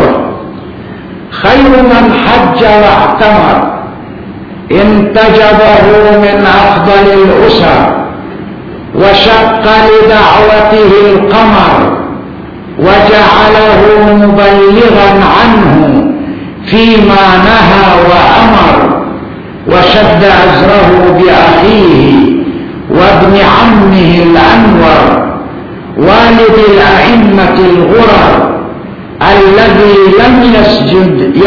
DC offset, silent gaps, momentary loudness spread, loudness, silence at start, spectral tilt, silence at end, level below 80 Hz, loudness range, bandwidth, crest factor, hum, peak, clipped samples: under 0.1%; none; 16 LU; -4 LUFS; 0 s; -7.5 dB/octave; 0 s; -24 dBFS; 2 LU; 5.4 kHz; 4 dB; none; 0 dBFS; 10%